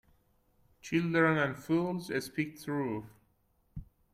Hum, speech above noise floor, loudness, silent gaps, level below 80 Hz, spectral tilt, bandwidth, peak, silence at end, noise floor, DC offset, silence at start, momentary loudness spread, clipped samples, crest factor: none; 40 dB; -32 LUFS; none; -60 dBFS; -6.5 dB/octave; 15.5 kHz; -14 dBFS; 0.3 s; -72 dBFS; under 0.1%; 0.85 s; 23 LU; under 0.1%; 20 dB